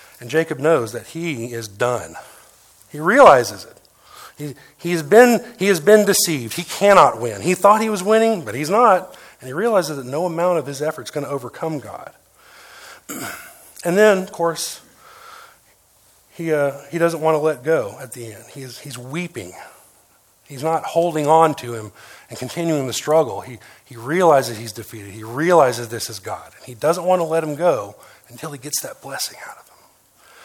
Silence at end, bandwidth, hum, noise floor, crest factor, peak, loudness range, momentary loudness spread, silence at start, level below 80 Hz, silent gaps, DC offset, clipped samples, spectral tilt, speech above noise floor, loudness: 0.9 s; 18 kHz; none; -55 dBFS; 20 dB; 0 dBFS; 9 LU; 21 LU; 0.2 s; -62 dBFS; none; under 0.1%; under 0.1%; -4.5 dB/octave; 37 dB; -18 LUFS